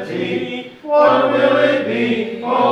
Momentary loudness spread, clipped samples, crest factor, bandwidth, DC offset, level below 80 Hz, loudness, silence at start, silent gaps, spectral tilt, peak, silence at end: 10 LU; under 0.1%; 14 dB; 9 kHz; under 0.1%; -66 dBFS; -16 LUFS; 0 s; none; -6.5 dB/octave; -2 dBFS; 0 s